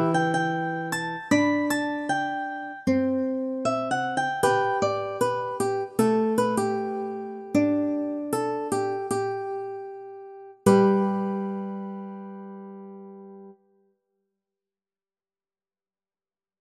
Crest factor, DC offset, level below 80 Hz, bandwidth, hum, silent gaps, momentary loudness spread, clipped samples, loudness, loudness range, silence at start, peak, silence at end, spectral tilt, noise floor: 22 dB; under 0.1%; -66 dBFS; 15.5 kHz; none; none; 18 LU; under 0.1%; -26 LUFS; 10 LU; 0 s; -4 dBFS; 3.05 s; -5.5 dB/octave; under -90 dBFS